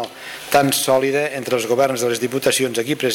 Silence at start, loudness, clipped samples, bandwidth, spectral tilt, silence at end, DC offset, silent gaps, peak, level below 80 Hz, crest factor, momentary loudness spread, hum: 0 s; -18 LUFS; under 0.1%; 17 kHz; -3.5 dB/octave; 0 s; under 0.1%; none; -6 dBFS; -58 dBFS; 12 dB; 5 LU; none